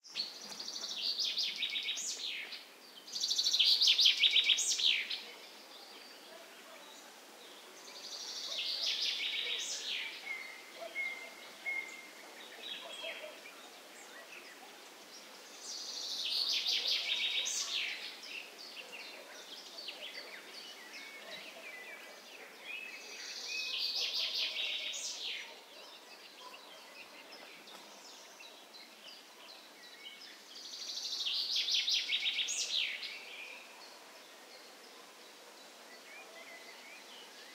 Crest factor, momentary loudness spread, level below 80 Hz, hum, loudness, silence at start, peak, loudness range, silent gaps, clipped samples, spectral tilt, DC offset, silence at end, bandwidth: 24 dB; 21 LU; under -90 dBFS; none; -34 LUFS; 0.05 s; -14 dBFS; 22 LU; none; under 0.1%; 2.5 dB/octave; under 0.1%; 0 s; 16 kHz